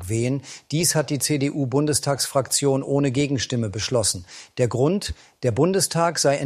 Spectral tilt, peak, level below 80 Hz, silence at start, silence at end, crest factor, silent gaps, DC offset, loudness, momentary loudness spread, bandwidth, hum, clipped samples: -4.5 dB/octave; -6 dBFS; -50 dBFS; 0 s; 0 s; 16 dB; none; under 0.1%; -22 LUFS; 7 LU; 15.5 kHz; none; under 0.1%